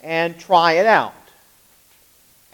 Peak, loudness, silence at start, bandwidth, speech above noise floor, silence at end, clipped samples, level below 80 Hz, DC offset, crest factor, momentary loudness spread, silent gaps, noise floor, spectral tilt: 0 dBFS; -16 LUFS; 0.05 s; 19 kHz; 37 dB; 1.45 s; under 0.1%; -70 dBFS; under 0.1%; 20 dB; 8 LU; none; -54 dBFS; -4.5 dB/octave